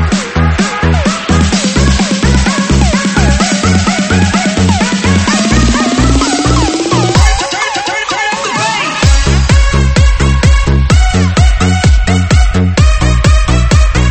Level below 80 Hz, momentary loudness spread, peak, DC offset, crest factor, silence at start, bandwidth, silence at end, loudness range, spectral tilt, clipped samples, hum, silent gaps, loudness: -12 dBFS; 3 LU; 0 dBFS; under 0.1%; 8 dB; 0 s; 8.8 kHz; 0 s; 1 LU; -5 dB/octave; 0.2%; none; none; -10 LUFS